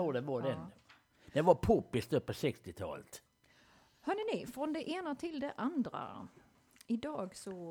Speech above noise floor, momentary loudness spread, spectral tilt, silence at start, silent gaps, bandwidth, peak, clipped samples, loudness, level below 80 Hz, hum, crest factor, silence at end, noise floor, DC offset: 31 dB; 17 LU; -6.5 dB/octave; 0 s; none; over 20 kHz; -12 dBFS; under 0.1%; -37 LUFS; -62 dBFS; none; 26 dB; 0 s; -67 dBFS; under 0.1%